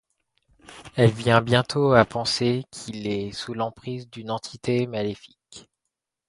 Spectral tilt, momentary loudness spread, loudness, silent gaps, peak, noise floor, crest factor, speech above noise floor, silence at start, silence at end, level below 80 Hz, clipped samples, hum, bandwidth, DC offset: -5.5 dB/octave; 16 LU; -23 LUFS; none; 0 dBFS; -83 dBFS; 24 dB; 60 dB; 0.7 s; 0.7 s; -54 dBFS; under 0.1%; none; 11.5 kHz; under 0.1%